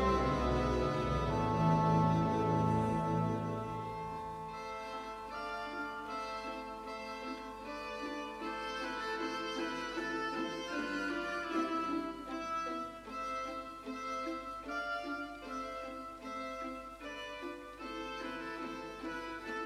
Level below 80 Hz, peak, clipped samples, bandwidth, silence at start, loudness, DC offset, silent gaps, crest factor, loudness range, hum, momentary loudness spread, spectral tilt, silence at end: -52 dBFS; -18 dBFS; under 0.1%; 13.5 kHz; 0 s; -38 LUFS; under 0.1%; none; 18 dB; 10 LU; none; 12 LU; -6.5 dB/octave; 0 s